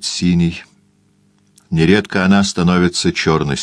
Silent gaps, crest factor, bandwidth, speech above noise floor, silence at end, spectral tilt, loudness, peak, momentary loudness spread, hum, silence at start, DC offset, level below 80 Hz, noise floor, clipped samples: none; 16 dB; 10.5 kHz; 41 dB; 0 s; -5 dB/octave; -15 LUFS; 0 dBFS; 5 LU; 50 Hz at -35 dBFS; 0 s; under 0.1%; -40 dBFS; -56 dBFS; under 0.1%